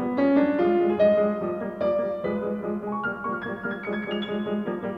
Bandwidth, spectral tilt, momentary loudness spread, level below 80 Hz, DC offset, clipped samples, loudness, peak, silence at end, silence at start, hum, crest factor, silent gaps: 5.4 kHz; -8.5 dB/octave; 10 LU; -60 dBFS; under 0.1%; under 0.1%; -25 LUFS; -10 dBFS; 0 s; 0 s; none; 14 dB; none